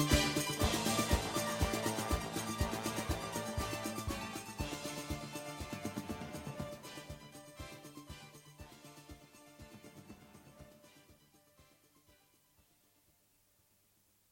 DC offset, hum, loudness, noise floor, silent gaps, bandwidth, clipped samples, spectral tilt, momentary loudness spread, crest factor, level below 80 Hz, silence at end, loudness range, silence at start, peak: under 0.1%; none; -38 LUFS; -73 dBFS; none; 16.5 kHz; under 0.1%; -4 dB/octave; 23 LU; 26 dB; -50 dBFS; 2.7 s; 22 LU; 0 s; -16 dBFS